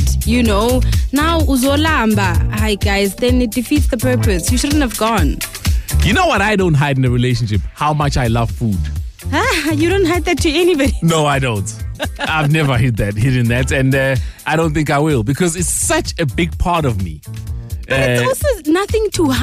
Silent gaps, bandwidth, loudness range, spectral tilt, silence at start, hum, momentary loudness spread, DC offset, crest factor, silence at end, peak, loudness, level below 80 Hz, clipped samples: none; 16 kHz; 2 LU; -5 dB/octave; 0 s; none; 6 LU; under 0.1%; 8 dB; 0 s; -6 dBFS; -15 LUFS; -24 dBFS; under 0.1%